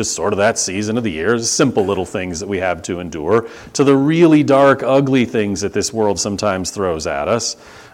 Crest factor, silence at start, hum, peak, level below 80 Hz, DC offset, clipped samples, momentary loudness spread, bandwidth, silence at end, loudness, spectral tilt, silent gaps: 16 dB; 0 s; none; 0 dBFS; -46 dBFS; under 0.1%; under 0.1%; 11 LU; 16 kHz; 0.05 s; -16 LUFS; -4.5 dB/octave; none